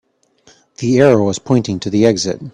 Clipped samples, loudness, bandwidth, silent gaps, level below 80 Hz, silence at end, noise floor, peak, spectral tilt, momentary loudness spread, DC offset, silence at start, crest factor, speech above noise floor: under 0.1%; -14 LUFS; 10.5 kHz; none; -50 dBFS; 0.05 s; -52 dBFS; 0 dBFS; -6 dB/octave; 8 LU; under 0.1%; 0.8 s; 16 dB; 38 dB